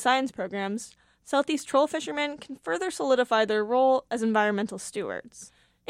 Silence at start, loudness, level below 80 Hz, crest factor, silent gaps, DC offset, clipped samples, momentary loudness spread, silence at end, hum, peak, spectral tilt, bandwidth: 0 s; -27 LUFS; -70 dBFS; 16 dB; none; under 0.1%; under 0.1%; 13 LU; 0.45 s; none; -10 dBFS; -3.5 dB/octave; 13.5 kHz